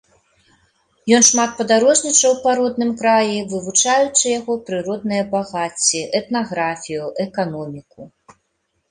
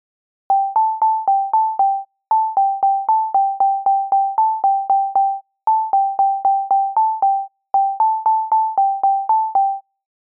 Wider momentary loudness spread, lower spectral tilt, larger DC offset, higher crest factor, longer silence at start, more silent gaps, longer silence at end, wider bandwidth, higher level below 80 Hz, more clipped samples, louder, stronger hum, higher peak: first, 12 LU vs 3 LU; second, -2.5 dB/octave vs -7.5 dB/octave; neither; first, 18 dB vs 8 dB; first, 1.05 s vs 0.5 s; neither; first, 0.85 s vs 0.5 s; first, 11.5 kHz vs 1.6 kHz; first, -60 dBFS vs -78 dBFS; neither; about the same, -17 LUFS vs -17 LUFS; neither; first, 0 dBFS vs -8 dBFS